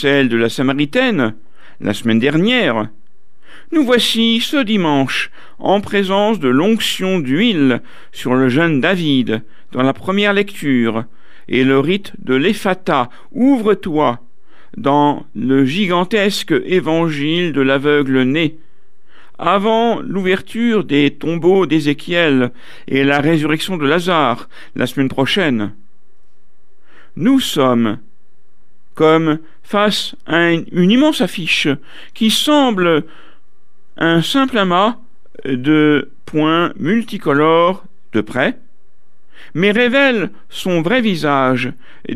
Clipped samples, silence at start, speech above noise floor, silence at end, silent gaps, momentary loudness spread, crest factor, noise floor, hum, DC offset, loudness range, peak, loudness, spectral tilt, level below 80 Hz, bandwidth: under 0.1%; 0 s; 46 dB; 0 s; none; 9 LU; 16 dB; -61 dBFS; none; 4%; 2 LU; 0 dBFS; -15 LUFS; -5.5 dB/octave; -54 dBFS; 15 kHz